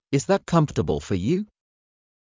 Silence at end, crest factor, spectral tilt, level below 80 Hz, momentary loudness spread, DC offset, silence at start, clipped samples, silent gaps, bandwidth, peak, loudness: 0.9 s; 18 dB; -6.5 dB/octave; -44 dBFS; 6 LU; under 0.1%; 0.1 s; under 0.1%; none; 7.8 kHz; -6 dBFS; -23 LUFS